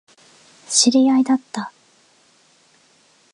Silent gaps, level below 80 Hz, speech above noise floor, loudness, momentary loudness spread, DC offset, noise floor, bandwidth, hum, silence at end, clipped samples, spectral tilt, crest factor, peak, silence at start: none; -78 dBFS; 40 dB; -17 LUFS; 17 LU; under 0.1%; -56 dBFS; 11.5 kHz; none; 1.65 s; under 0.1%; -2 dB/octave; 20 dB; -2 dBFS; 0.7 s